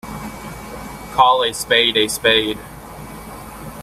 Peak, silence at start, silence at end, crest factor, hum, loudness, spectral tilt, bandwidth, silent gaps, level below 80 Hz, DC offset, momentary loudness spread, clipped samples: 0 dBFS; 0.05 s; 0 s; 20 dB; none; -15 LUFS; -2.5 dB/octave; 16 kHz; none; -44 dBFS; under 0.1%; 20 LU; under 0.1%